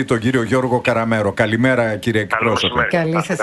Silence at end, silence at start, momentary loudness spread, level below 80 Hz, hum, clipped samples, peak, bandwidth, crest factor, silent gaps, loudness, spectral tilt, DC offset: 0 s; 0 s; 3 LU; -46 dBFS; none; under 0.1%; 0 dBFS; 12 kHz; 16 dB; none; -17 LUFS; -5.5 dB/octave; under 0.1%